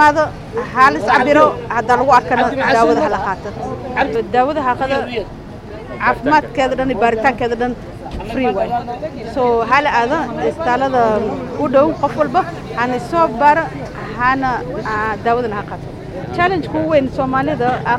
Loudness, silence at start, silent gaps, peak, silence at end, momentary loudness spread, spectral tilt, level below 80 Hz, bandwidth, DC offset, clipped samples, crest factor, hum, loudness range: -16 LUFS; 0 s; none; 0 dBFS; 0 s; 13 LU; -6 dB/octave; -38 dBFS; 13 kHz; under 0.1%; under 0.1%; 16 dB; none; 5 LU